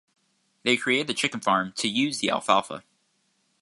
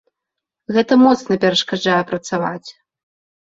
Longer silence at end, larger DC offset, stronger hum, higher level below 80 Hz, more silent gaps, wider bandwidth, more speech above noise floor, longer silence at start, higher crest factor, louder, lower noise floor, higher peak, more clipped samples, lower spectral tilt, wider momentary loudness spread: about the same, 0.8 s vs 0.8 s; neither; neither; second, -70 dBFS vs -62 dBFS; neither; first, 11.5 kHz vs 7.8 kHz; second, 45 dB vs 66 dB; about the same, 0.65 s vs 0.7 s; first, 22 dB vs 16 dB; second, -24 LUFS vs -16 LUFS; second, -70 dBFS vs -82 dBFS; second, -6 dBFS vs -2 dBFS; neither; second, -3 dB/octave vs -5 dB/octave; second, 6 LU vs 10 LU